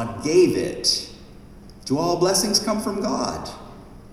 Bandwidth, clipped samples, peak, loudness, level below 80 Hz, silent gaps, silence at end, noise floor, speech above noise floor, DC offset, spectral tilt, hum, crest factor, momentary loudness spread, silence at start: 15 kHz; under 0.1%; -6 dBFS; -21 LUFS; -48 dBFS; none; 0 s; -43 dBFS; 22 dB; under 0.1%; -3.5 dB/octave; none; 18 dB; 18 LU; 0 s